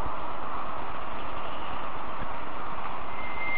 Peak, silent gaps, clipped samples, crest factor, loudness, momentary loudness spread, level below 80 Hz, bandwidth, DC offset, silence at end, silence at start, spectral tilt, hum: -16 dBFS; none; under 0.1%; 16 dB; -36 LUFS; 1 LU; -48 dBFS; 4.9 kHz; 8%; 0 s; 0 s; -3 dB/octave; none